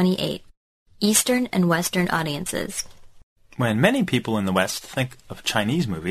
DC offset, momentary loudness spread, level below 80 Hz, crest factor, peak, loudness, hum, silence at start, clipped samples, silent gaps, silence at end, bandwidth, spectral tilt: under 0.1%; 10 LU; -52 dBFS; 22 dB; -2 dBFS; -23 LUFS; none; 0 s; under 0.1%; 0.57-0.86 s, 3.23-3.36 s; 0 s; 14 kHz; -4 dB/octave